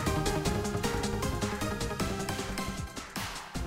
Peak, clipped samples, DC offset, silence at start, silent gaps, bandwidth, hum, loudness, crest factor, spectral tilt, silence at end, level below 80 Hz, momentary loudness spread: -16 dBFS; under 0.1%; under 0.1%; 0 s; none; 16 kHz; none; -33 LUFS; 16 dB; -4.5 dB/octave; 0 s; -42 dBFS; 7 LU